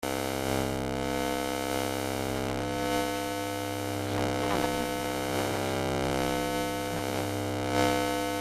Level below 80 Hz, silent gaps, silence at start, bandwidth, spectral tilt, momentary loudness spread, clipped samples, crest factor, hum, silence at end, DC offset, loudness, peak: -48 dBFS; none; 0 s; 16 kHz; -4.5 dB/octave; 3 LU; under 0.1%; 20 dB; none; 0 s; under 0.1%; -30 LUFS; -10 dBFS